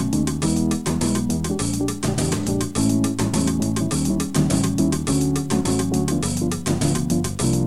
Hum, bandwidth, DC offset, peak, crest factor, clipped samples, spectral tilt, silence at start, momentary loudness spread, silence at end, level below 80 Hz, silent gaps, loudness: none; 16 kHz; 1%; -6 dBFS; 14 dB; under 0.1%; -5.5 dB/octave; 0 s; 3 LU; 0 s; -36 dBFS; none; -21 LUFS